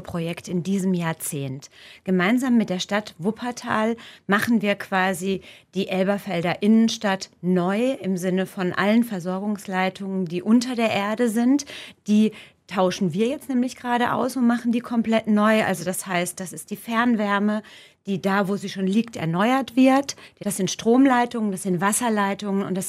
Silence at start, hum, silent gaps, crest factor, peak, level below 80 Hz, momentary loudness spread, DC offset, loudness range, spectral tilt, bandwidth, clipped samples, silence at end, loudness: 0 s; none; none; 16 dB; -6 dBFS; -66 dBFS; 10 LU; under 0.1%; 3 LU; -5 dB/octave; 15.5 kHz; under 0.1%; 0 s; -23 LUFS